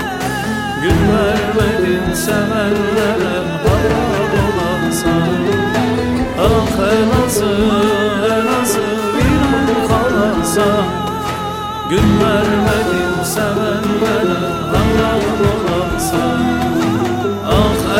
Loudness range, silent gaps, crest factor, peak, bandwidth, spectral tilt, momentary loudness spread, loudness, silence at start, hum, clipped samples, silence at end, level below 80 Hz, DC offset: 1 LU; none; 12 dB; -2 dBFS; 16.5 kHz; -5.5 dB/octave; 4 LU; -15 LUFS; 0 s; none; under 0.1%; 0 s; -30 dBFS; 0.2%